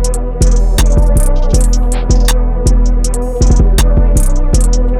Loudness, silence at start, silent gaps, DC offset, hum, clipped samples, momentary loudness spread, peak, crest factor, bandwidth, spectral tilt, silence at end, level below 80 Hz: -13 LUFS; 0 s; none; 0.6%; none; under 0.1%; 3 LU; -2 dBFS; 8 dB; 14.5 kHz; -5.5 dB/octave; 0 s; -8 dBFS